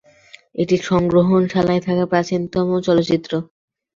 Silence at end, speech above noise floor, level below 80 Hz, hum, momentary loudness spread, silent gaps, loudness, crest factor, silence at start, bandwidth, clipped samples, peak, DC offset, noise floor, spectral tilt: 0.5 s; 30 dB; -50 dBFS; none; 9 LU; none; -18 LUFS; 16 dB; 0.55 s; 7.6 kHz; under 0.1%; -4 dBFS; under 0.1%; -47 dBFS; -7 dB/octave